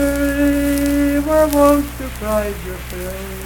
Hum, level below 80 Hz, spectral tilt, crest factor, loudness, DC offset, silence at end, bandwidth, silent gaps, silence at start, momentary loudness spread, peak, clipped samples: none; -28 dBFS; -5.5 dB/octave; 16 dB; -17 LUFS; under 0.1%; 0 s; 19 kHz; none; 0 s; 14 LU; 0 dBFS; under 0.1%